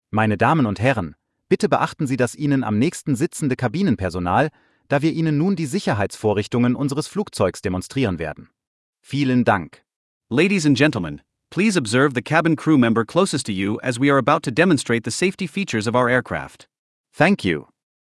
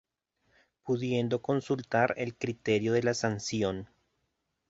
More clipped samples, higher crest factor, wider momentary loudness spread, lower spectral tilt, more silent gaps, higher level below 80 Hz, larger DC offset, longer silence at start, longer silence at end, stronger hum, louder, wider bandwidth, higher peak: neither; about the same, 18 dB vs 20 dB; about the same, 9 LU vs 7 LU; about the same, -6 dB/octave vs -5.5 dB/octave; first, 8.67-8.93 s, 9.96-10.20 s, 16.79-17.04 s vs none; first, -54 dBFS vs -62 dBFS; neither; second, 0.15 s vs 0.85 s; second, 0.4 s vs 0.85 s; neither; first, -20 LUFS vs -30 LUFS; first, 12 kHz vs 8 kHz; first, -2 dBFS vs -12 dBFS